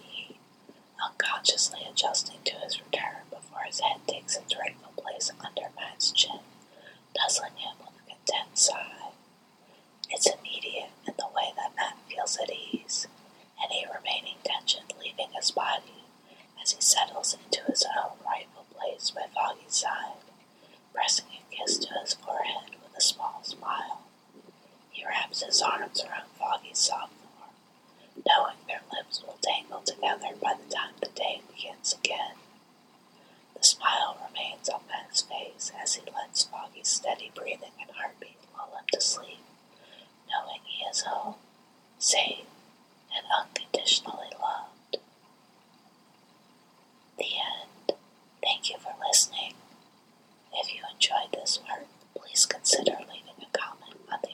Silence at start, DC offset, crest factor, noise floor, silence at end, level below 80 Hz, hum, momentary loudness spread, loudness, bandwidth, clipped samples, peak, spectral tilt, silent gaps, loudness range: 0 s; under 0.1%; 28 dB; -60 dBFS; 0 s; under -90 dBFS; none; 16 LU; -29 LUFS; 17 kHz; under 0.1%; -4 dBFS; 1 dB/octave; none; 5 LU